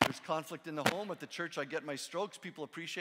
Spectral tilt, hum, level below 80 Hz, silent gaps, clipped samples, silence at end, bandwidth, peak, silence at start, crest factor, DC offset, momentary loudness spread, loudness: -3.5 dB/octave; none; -74 dBFS; none; under 0.1%; 0 s; 16 kHz; -10 dBFS; 0 s; 28 dB; under 0.1%; 9 LU; -38 LUFS